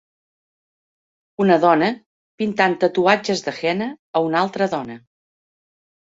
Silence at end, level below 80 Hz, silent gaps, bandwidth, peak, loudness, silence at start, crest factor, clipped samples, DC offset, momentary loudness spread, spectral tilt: 1.15 s; -64 dBFS; 2.06-2.38 s, 3.99-4.14 s; 8 kHz; -2 dBFS; -19 LUFS; 1.4 s; 20 dB; under 0.1%; under 0.1%; 11 LU; -5.5 dB/octave